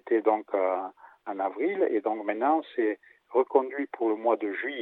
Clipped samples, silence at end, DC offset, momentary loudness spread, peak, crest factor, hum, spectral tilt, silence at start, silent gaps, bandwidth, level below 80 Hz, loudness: under 0.1%; 0 s; under 0.1%; 8 LU; -8 dBFS; 20 dB; none; -7.5 dB/octave; 0.05 s; none; 4.1 kHz; -90 dBFS; -28 LUFS